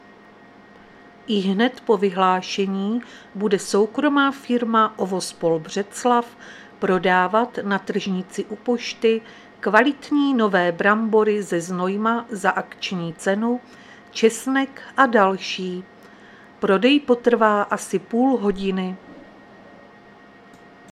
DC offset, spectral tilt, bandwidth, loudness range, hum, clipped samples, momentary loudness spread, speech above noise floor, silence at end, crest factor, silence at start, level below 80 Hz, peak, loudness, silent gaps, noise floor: under 0.1%; -5 dB/octave; 14 kHz; 3 LU; none; under 0.1%; 10 LU; 27 dB; 1.7 s; 22 dB; 1.3 s; -60 dBFS; 0 dBFS; -21 LUFS; none; -47 dBFS